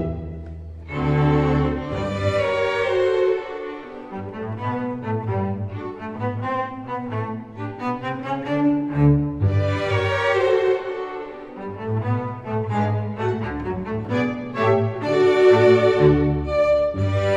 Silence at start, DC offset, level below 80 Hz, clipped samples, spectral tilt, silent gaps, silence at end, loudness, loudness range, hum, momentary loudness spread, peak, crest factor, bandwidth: 0 s; 0.1%; -40 dBFS; under 0.1%; -8 dB/octave; none; 0 s; -21 LUFS; 9 LU; none; 15 LU; -2 dBFS; 18 dB; 8.8 kHz